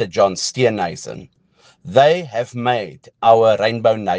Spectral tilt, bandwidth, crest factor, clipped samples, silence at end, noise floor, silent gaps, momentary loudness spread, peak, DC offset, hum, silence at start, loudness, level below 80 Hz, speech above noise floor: -4.5 dB/octave; 10 kHz; 18 dB; under 0.1%; 0 s; -54 dBFS; none; 16 LU; 0 dBFS; under 0.1%; none; 0 s; -16 LUFS; -62 dBFS; 37 dB